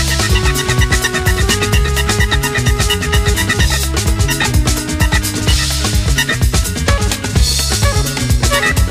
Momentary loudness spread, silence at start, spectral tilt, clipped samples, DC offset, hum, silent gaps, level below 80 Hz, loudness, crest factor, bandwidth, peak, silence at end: 2 LU; 0 s; -3.5 dB/octave; under 0.1%; under 0.1%; none; none; -18 dBFS; -14 LUFS; 14 dB; 15.5 kHz; 0 dBFS; 0 s